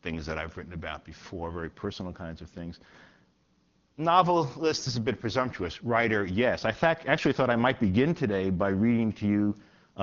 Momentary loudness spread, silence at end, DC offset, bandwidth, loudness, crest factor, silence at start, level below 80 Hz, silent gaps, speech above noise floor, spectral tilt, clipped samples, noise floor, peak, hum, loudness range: 15 LU; 0 s; under 0.1%; 7.4 kHz; -28 LUFS; 22 dB; 0.05 s; -56 dBFS; none; 40 dB; -5 dB/octave; under 0.1%; -68 dBFS; -8 dBFS; none; 12 LU